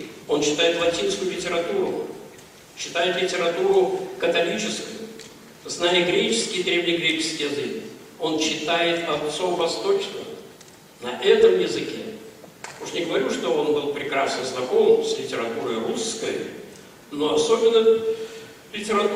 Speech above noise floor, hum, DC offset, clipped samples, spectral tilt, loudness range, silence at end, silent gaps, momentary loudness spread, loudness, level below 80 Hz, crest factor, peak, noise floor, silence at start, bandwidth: 25 dB; none; under 0.1%; under 0.1%; -3 dB/octave; 2 LU; 0 s; none; 18 LU; -22 LUFS; -64 dBFS; 20 dB; -4 dBFS; -47 dBFS; 0 s; 16 kHz